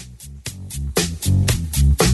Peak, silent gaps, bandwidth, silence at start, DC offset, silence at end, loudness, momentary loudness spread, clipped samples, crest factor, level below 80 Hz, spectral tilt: -4 dBFS; none; 12.5 kHz; 0 s; under 0.1%; 0 s; -20 LUFS; 15 LU; under 0.1%; 16 dB; -24 dBFS; -4.5 dB/octave